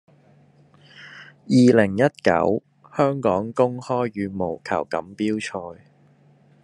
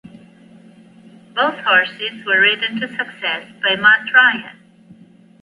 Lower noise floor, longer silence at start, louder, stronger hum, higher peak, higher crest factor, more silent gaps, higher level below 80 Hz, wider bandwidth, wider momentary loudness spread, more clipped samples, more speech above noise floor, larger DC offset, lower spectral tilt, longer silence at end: first, -55 dBFS vs -46 dBFS; second, 1 s vs 1.35 s; second, -21 LUFS vs -15 LUFS; neither; about the same, -2 dBFS vs 0 dBFS; about the same, 20 dB vs 18 dB; neither; about the same, -64 dBFS vs -68 dBFS; about the same, 11 kHz vs 11 kHz; first, 19 LU vs 12 LU; neither; first, 35 dB vs 29 dB; neither; first, -7 dB/octave vs -4.5 dB/octave; about the same, 0.9 s vs 0.9 s